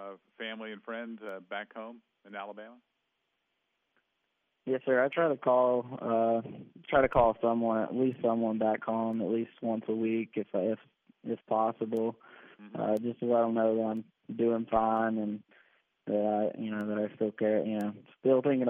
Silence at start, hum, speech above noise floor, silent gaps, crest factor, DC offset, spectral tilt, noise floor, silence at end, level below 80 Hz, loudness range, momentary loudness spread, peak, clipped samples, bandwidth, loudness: 0 s; none; 50 dB; none; 20 dB; under 0.1%; -5.5 dB/octave; -81 dBFS; 0 s; -60 dBFS; 14 LU; 16 LU; -10 dBFS; under 0.1%; 3.8 kHz; -31 LUFS